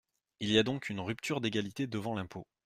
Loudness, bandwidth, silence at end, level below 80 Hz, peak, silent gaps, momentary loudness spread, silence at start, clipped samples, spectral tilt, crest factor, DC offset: -34 LUFS; 15 kHz; 0.25 s; -68 dBFS; -12 dBFS; none; 11 LU; 0.4 s; under 0.1%; -5 dB/octave; 22 dB; under 0.1%